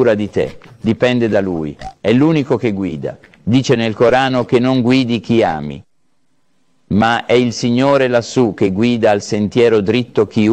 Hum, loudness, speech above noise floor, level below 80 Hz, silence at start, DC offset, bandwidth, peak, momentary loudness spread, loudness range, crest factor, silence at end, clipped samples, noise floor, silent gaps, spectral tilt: none; -14 LUFS; 52 dB; -46 dBFS; 0 s; 0.2%; 9 kHz; -2 dBFS; 10 LU; 2 LU; 12 dB; 0 s; under 0.1%; -66 dBFS; none; -6.5 dB/octave